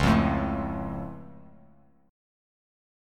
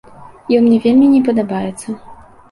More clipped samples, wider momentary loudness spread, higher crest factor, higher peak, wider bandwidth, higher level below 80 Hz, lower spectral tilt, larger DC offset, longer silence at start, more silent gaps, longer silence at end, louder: neither; first, 22 LU vs 18 LU; first, 20 dB vs 12 dB; second, -10 dBFS vs -2 dBFS; first, 13.5 kHz vs 11.5 kHz; first, -40 dBFS vs -50 dBFS; about the same, -7 dB/octave vs -7 dB/octave; neither; second, 0 s vs 0.2 s; neither; first, 1 s vs 0.35 s; second, -28 LUFS vs -13 LUFS